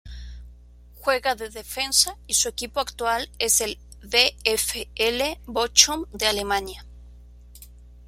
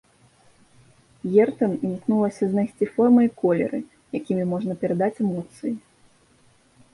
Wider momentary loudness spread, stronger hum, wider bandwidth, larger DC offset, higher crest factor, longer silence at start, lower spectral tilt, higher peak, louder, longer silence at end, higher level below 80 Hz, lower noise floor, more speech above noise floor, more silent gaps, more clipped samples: about the same, 14 LU vs 14 LU; first, 60 Hz at -45 dBFS vs none; first, 16.5 kHz vs 11.5 kHz; neither; first, 26 dB vs 18 dB; second, 0.05 s vs 1.25 s; second, -0.5 dB/octave vs -9 dB/octave; first, 0 dBFS vs -6 dBFS; about the same, -22 LUFS vs -23 LUFS; second, 0.05 s vs 1.15 s; first, -44 dBFS vs -64 dBFS; second, -48 dBFS vs -58 dBFS; second, 24 dB vs 37 dB; neither; neither